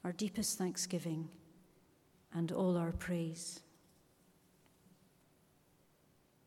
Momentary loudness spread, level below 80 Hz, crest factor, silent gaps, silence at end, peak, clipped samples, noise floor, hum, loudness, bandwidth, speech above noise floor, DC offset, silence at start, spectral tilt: 11 LU; -64 dBFS; 18 dB; none; 2.85 s; -24 dBFS; under 0.1%; -71 dBFS; none; -39 LUFS; 16.5 kHz; 33 dB; under 0.1%; 0.05 s; -5 dB/octave